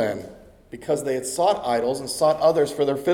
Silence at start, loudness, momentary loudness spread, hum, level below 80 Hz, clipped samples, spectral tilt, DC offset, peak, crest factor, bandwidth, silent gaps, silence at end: 0 s; -22 LUFS; 16 LU; none; -56 dBFS; under 0.1%; -4.5 dB/octave; under 0.1%; -6 dBFS; 16 dB; 18 kHz; none; 0 s